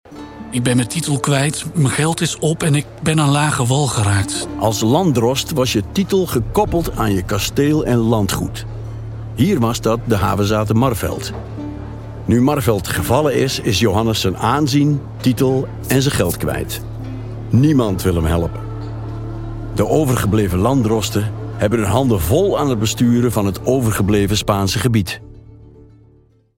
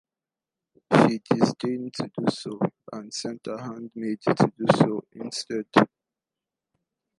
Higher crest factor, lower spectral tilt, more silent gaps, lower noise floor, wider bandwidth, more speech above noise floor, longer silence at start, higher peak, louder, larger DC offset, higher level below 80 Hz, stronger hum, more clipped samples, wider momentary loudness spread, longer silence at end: second, 16 dB vs 24 dB; about the same, -5.5 dB/octave vs -6 dB/octave; neither; second, -51 dBFS vs under -90 dBFS; first, 17 kHz vs 11.5 kHz; second, 35 dB vs over 65 dB; second, 0.1 s vs 0.9 s; about the same, 0 dBFS vs -2 dBFS; first, -17 LUFS vs -25 LUFS; neither; first, -34 dBFS vs -68 dBFS; neither; neither; about the same, 12 LU vs 13 LU; second, 0.9 s vs 1.35 s